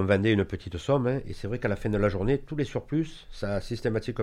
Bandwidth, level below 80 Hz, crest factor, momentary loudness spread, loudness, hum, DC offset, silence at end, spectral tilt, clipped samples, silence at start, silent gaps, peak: 12 kHz; -42 dBFS; 18 dB; 8 LU; -29 LUFS; none; under 0.1%; 0 s; -7.5 dB/octave; under 0.1%; 0 s; none; -10 dBFS